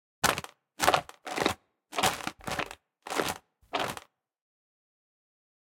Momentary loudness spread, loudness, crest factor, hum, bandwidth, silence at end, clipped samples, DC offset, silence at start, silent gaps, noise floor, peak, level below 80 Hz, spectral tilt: 16 LU; -31 LUFS; 30 dB; none; 17 kHz; 1.65 s; under 0.1%; under 0.1%; 0.25 s; none; -50 dBFS; -2 dBFS; -60 dBFS; -2 dB/octave